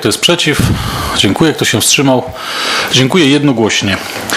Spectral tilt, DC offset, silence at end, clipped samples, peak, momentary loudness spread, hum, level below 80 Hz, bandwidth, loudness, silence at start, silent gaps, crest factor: -3.5 dB/octave; under 0.1%; 0 s; 0.1%; 0 dBFS; 7 LU; none; -32 dBFS; 16.5 kHz; -10 LUFS; 0 s; none; 12 dB